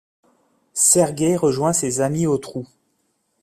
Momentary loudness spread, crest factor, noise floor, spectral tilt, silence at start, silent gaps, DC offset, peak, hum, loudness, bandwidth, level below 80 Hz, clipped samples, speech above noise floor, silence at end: 15 LU; 18 dB; -69 dBFS; -4.5 dB/octave; 0.75 s; none; under 0.1%; -2 dBFS; none; -18 LUFS; 16 kHz; -58 dBFS; under 0.1%; 50 dB; 0.75 s